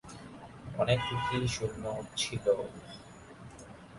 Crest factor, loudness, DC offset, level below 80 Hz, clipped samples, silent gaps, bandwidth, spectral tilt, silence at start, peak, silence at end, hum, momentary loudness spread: 20 dB; -33 LUFS; under 0.1%; -54 dBFS; under 0.1%; none; 11.5 kHz; -4.5 dB/octave; 0.05 s; -14 dBFS; 0 s; none; 20 LU